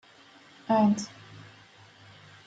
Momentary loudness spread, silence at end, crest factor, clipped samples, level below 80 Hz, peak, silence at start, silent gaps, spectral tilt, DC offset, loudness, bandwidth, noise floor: 25 LU; 1.05 s; 18 dB; under 0.1%; -74 dBFS; -12 dBFS; 0.7 s; none; -6 dB/octave; under 0.1%; -26 LUFS; 8 kHz; -55 dBFS